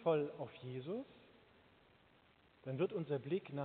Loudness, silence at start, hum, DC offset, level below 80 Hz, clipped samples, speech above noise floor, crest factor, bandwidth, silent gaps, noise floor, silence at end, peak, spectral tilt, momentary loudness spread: -42 LUFS; 0 s; none; under 0.1%; -82 dBFS; under 0.1%; 29 dB; 20 dB; 4.5 kHz; none; -70 dBFS; 0 s; -24 dBFS; -6.5 dB/octave; 15 LU